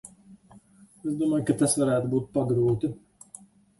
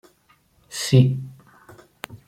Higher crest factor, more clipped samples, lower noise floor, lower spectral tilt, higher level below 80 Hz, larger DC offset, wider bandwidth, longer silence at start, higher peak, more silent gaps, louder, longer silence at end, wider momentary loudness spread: about the same, 18 dB vs 20 dB; neither; second, -55 dBFS vs -60 dBFS; about the same, -6 dB/octave vs -6 dB/octave; about the same, -60 dBFS vs -58 dBFS; neither; second, 12 kHz vs 15 kHz; second, 0.05 s vs 0.7 s; second, -10 dBFS vs -4 dBFS; neither; second, -26 LUFS vs -20 LUFS; first, 0.8 s vs 0.1 s; about the same, 23 LU vs 22 LU